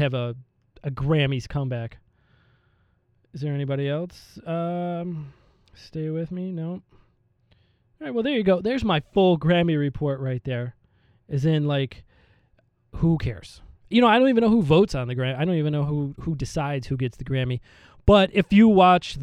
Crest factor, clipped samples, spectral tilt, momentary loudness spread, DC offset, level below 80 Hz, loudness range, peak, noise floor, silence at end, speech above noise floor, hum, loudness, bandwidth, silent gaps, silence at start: 18 dB; under 0.1%; -7.5 dB/octave; 17 LU; under 0.1%; -44 dBFS; 10 LU; -4 dBFS; -65 dBFS; 0 s; 43 dB; none; -23 LUFS; 10.5 kHz; none; 0 s